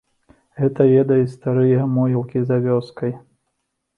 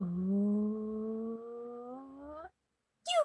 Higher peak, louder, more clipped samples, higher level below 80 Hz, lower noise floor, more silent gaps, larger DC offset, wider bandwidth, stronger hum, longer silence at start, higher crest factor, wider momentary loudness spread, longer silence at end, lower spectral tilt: first, -2 dBFS vs -18 dBFS; first, -18 LUFS vs -36 LUFS; neither; first, -60 dBFS vs -70 dBFS; second, -74 dBFS vs -83 dBFS; neither; neither; second, 5.2 kHz vs 11.5 kHz; neither; first, 0.55 s vs 0 s; about the same, 16 dB vs 16 dB; second, 12 LU vs 17 LU; first, 0.8 s vs 0 s; first, -10.5 dB/octave vs -6 dB/octave